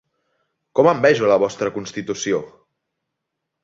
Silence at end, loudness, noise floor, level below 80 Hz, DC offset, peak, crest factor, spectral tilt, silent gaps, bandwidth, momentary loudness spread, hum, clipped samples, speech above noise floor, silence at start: 1.15 s; -19 LUFS; -79 dBFS; -62 dBFS; under 0.1%; -2 dBFS; 20 dB; -5 dB/octave; none; 7.8 kHz; 11 LU; none; under 0.1%; 61 dB; 0.75 s